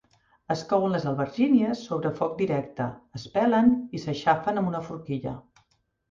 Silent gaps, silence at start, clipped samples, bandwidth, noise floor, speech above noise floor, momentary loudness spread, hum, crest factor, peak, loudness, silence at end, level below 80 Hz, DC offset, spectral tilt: none; 0.5 s; under 0.1%; 7.4 kHz; -69 dBFS; 44 dB; 12 LU; none; 20 dB; -8 dBFS; -26 LUFS; 0.7 s; -60 dBFS; under 0.1%; -7.5 dB/octave